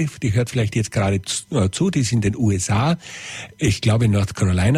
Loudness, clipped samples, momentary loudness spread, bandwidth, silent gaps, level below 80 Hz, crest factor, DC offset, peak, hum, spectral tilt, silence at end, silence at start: -20 LUFS; under 0.1%; 5 LU; 13.5 kHz; none; -42 dBFS; 14 dB; under 0.1%; -6 dBFS; none; -5.5 dB/octave; 0 s; 0 s